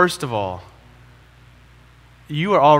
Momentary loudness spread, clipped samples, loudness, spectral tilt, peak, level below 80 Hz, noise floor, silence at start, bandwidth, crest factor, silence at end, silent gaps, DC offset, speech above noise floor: 13 LU; under 0.1%; -21 LUFS; -5.5 dB/octave; 0 dBFS; -52 dBFS; -48 dBFS; 0 s; 16 kHz; 20 dB; 0 s; none; under 0.1%; 31 dB